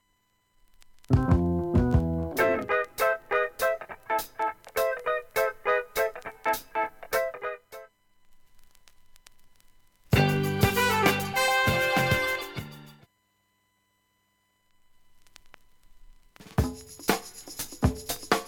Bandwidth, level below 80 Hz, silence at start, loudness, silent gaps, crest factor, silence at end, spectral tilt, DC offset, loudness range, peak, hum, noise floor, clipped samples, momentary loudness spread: 17.5 kHz; -42 dBFS; 1.1 s; -27 LUFS; none; 22 dB; 0 s; -5 dB/octave; under 0.1%; 11 LU; -6 dBFS; none; -72 dBFS; under 0.1%; 12 LU